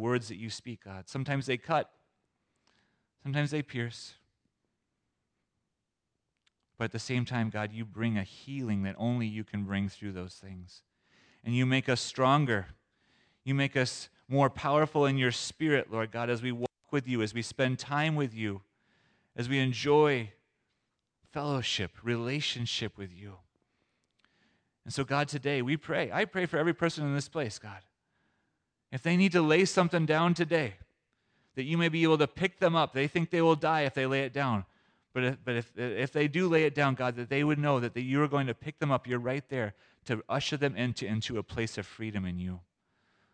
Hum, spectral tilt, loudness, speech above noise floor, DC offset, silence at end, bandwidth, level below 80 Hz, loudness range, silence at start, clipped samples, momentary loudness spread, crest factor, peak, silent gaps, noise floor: none; -5.5 dB/octave; -31 LUFS; 55 dB; under 0.1%; 0.75 s; 10 kHz; -66 dBFS; 8 LU; 0 s; under 0.1%; 14 LU; 20 dB; -12 dBFS; none; -85 dBFS